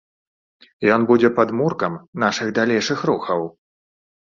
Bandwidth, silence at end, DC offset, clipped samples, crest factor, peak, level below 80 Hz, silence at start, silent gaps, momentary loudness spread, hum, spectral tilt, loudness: 7.4 kHz; 0.8 s; under 0.1%; under 0.1%; 18 dB; -2 dBFS; -60 dBFS; 0.8 s; 2.08-2.13 s; 9 LU; none; -5.5 dB/octave; -19 LUFS